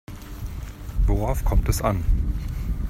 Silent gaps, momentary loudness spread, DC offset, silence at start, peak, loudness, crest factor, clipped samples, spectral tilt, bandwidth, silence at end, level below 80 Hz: none; 13 LU; under 0.1%; 0.1 s; -8 dBFS; -26 LUFS; 16 dB; under 0.1%; -6.5 dB/octave; 15.5 kHz; 0 s; -24 dBFS